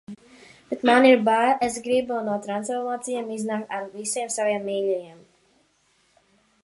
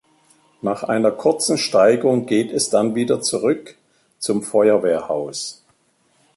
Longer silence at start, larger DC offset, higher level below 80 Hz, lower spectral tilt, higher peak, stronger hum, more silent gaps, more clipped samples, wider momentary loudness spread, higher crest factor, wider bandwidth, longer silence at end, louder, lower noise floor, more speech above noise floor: second, 0.1 s vs 0.65 s; neither; about the same, -68 dBFS vs -64 dBFS; about the same, -3.5 dB/octave vs -4 dB/octave; about the same, -4 dBFS vs -4 dBFS; neither; neither; neither; first, 14 LU vs 11 LU; about the same, 20 dB vs 16 dB; about the same, 11.5 kHz vs 12 kHz; first, 1.5 s vs 0.85 s; second, -23 LUFS vs -19 LUFS; about the same, -65 dBFS vs -62 dBFS; about the same, 42 dB vs 44 dB